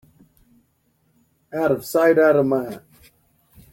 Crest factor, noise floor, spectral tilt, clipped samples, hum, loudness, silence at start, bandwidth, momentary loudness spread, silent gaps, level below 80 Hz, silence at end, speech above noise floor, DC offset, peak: 18 dB; -65 dBFS; -6.5 dB/octave; under 0.1%; none; -19 LUFS; 1.55 s; 16.5 kHz; 18 LU; none; -62 dBFS; 0.95 s; 47 dB; under 0.1%; -4 dBFS